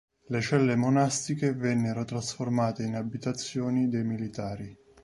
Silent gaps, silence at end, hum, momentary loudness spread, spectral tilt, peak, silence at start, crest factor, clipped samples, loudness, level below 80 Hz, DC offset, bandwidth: none; 0.3 s; none; 10 LU; -5.5 dB/octave; -12 dBFS; 0.3 s; 18 dB; under 0.1%; -29 LUFS; -62 dBFS; under 0.1%; 11.5 kHz